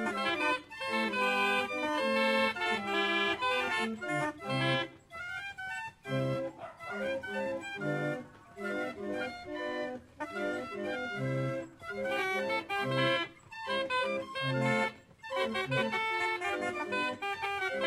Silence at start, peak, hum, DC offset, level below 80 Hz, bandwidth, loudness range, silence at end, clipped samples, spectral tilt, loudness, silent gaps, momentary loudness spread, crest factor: 0 s; -16 dBFS; none; under 0.1%; -68 dBFS; 16 kHz; 7 LU; 0 s; under 0.1%; -5 dB/octave; -33 LUFS; none; 11 LU; 18 dB